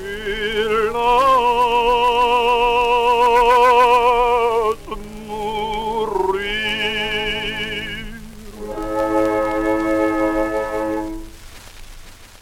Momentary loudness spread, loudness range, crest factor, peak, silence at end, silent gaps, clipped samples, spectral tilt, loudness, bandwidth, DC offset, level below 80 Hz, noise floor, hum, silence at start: 15 LU; 7 LU; 14 dB; -4 dBFS; 0.15 s; none; under 0.1%; -4 dB/octave; -17 LUFS; 16.5 kHz; under 0.1%; -36 dBFS; -39 dBFS; none; 0 s